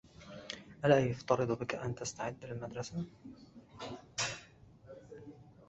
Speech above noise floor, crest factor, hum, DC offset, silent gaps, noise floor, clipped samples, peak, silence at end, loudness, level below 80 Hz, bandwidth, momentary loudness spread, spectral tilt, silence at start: 24 dB; 24 dB; none; under 0.1%; none; -59 dBFS; under 0.1%; -12 dBFS; 0.05 s; -36 LUFS; -66 dBFS; 8 kHz; 25 LU; -5 dB/octave; 0.05 s